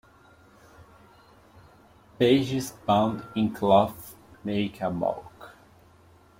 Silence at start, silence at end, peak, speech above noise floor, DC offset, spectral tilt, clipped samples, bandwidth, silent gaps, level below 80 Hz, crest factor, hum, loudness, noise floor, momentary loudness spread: 0.8 s; 0.9 s; -6 dBFS; 32 dB; under 0.1%; -6 dB/octave; under 0.1%; 16.5 kHz; none; -60 dBFS; 22 dB; none; -25 LUFS; -56 dBFS; 17 LU